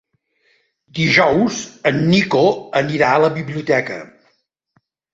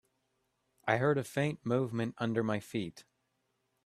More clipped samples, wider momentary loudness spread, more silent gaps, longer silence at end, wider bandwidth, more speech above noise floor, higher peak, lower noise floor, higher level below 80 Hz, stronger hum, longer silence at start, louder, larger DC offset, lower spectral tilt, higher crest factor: neither; about the same, 10 LU vs 9 LU; neither; first, 1.1 s vs 0.85 s; second, 8 kHz vs 14 kHz; about the same, 48 dB vs 47 dB; first, -2 dBFS vs -12 dBFS; second, -64 dBFS vs -80 dBFS; first, -54 dBFS vs -72 dBFS; neither; about the same, 0.95 s vs 0.85 s; first, -16 LUFS vs -33 LUFS; neither; about the same, -5.5 dB/octave vs -6.5 dB/octave; second, 16 dB vs 24 dB